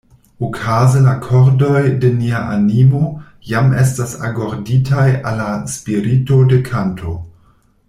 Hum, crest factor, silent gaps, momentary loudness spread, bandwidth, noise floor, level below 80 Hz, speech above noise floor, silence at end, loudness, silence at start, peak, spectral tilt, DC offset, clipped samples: none; 12 dB; none; 11 LU; 12.5 kHz; -52 dBFS; -42 dBFS; 39 dB; 0.6 s; -14 LUFS; 0.4 s; -2 dBFS; -7.5 dB/octave; under 0.1%; under 0.1%